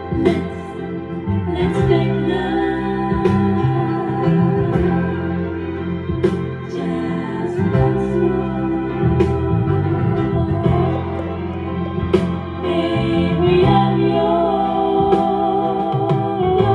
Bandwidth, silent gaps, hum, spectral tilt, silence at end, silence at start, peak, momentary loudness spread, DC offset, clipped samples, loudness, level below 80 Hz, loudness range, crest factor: 9.6 kHz; none; none; -9 dB/octave; 0 s; 0 s; -2 dBFS; 8 LU; under 0.1%; under 0.1%; -18 LUFS; -36 dBFS; 4 LU; 16 dB